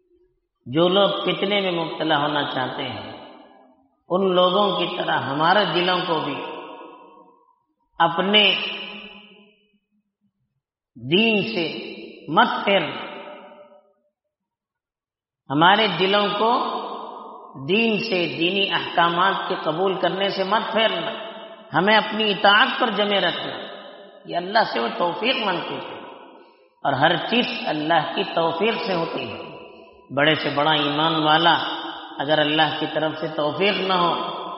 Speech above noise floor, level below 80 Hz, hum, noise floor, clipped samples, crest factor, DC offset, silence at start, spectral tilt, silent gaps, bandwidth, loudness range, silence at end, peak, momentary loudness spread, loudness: over 69 dB; -68 dBFS; none; under -90 dBFS; under 0.1%; 20 dB; under 0.1%; 0.65 s; -1.5 dB/octave; none; 6 kHz; 5 LU; 0 s; -2 dBFS; 17 LU; -20 LUFS